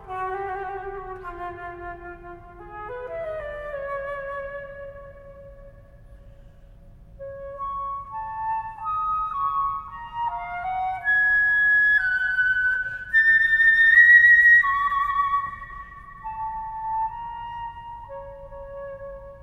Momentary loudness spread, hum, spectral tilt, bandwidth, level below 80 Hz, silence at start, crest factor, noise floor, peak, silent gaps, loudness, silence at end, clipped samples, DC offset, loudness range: 24 LU; none; -4.5 dB/octave; 9.6 kHz; -48 dBFS; 0 s; 18 dB; -47 dBFS; -4 dBFS; none; -19 LUFS; 0 s; under 0.1%; under 0.1%; 21 LU